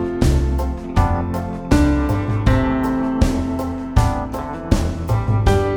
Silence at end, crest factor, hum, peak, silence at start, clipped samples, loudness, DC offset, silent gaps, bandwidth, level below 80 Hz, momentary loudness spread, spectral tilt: 0 s; 18 dB; none; 0 dBFS; 0 s; under 0.1%; -19 LUFS; under 0.1%; none; 17.5 kHz; -22 dBFS; 7 LU; -7 dB/octave